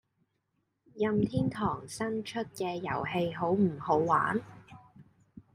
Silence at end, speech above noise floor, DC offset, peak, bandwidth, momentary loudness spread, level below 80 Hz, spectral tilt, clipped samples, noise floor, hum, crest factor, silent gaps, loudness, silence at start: 0.15 s; 49 dB; under 0.1%; -12 dBFS; 15 kHz; 8 LU; -62 dBFS; -6.5 dB/octave; under 0.1%; -79 dBFS; none; 20 dB; none; -31 LUFS; 0.95 s